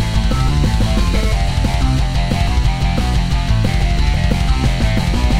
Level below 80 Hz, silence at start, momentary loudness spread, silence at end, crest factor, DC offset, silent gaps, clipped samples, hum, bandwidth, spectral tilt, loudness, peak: -16 dBFS; 0 s; 1 LU; 0 s; 12 dB; under 0.1%; none; under 0.1%; none; 13 kHz; -6 dB/octave; -17 LUFS; -2 dBFS